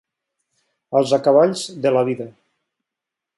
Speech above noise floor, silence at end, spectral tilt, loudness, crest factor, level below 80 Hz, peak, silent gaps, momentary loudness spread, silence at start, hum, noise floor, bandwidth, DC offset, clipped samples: 68 dB; 1.1 s; -5.5 dB/octave; -18 LUFS; 18 dB; -70 dBFS; -2 dBFS; none; 11 LU; 0.9 s; none; -85 dBFS; 11.5 kHz; under 0.1%; under 0.1%